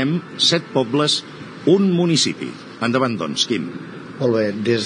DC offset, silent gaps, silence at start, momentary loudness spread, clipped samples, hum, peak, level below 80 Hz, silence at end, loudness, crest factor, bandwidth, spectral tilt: under 0.1%; none; 0 s; 14 LU; under 0.1%; none; -2 dBFS; -68 dBFS; 0 s; -19 LUFS; 18 dB; 10 kHz; -4.5 dB/octave